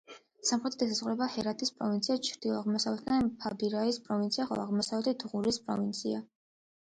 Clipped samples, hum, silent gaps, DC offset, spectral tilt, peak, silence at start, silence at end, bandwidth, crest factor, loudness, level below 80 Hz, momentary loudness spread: under 0.1%; none; none; under 0.1%; -4 dB/octave; -16 dBFS; 0.1 s; 0.6 s; 9.6 kHz; 18 dB; -32 LUFS; -68 dBFS; 3 LU